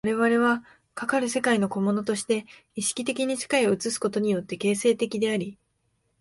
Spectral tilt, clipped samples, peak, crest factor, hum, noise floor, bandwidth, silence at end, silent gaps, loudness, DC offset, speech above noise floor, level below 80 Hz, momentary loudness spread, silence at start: -4 dB/octave; under 0.1%; -8 dBFS; 18 dB; none; -72 dBFS; 11.5 kHz; 0.65 s; none; -25 LUFS; under 0.1%; 47 dB; -66 dBFS; 7 LU; 0.05 s